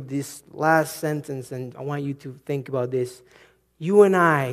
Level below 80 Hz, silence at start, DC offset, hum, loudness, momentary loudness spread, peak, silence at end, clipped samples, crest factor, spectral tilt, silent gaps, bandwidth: -68 dBFS; 0 s; under 0.1%; none; -23 LUFS; 16 LU; -2 dBFS; 0 s; under 0.1%; 20 dB; -6.5 dB/octave; none; 15 kHz